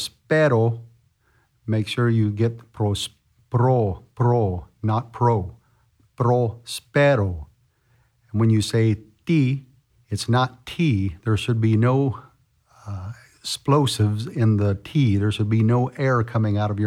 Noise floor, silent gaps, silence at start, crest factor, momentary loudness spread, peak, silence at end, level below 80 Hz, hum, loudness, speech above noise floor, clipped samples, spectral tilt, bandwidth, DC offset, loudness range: -63 dBFS; none; 0 s; 16 dB; 12 LU; -6 dBFS; 0 s; -50 dBFS; none; -22 LUFS; 43 dB; under 0.1%; -7 dB/octave; 13 kHz; under 0.1%; 2 LU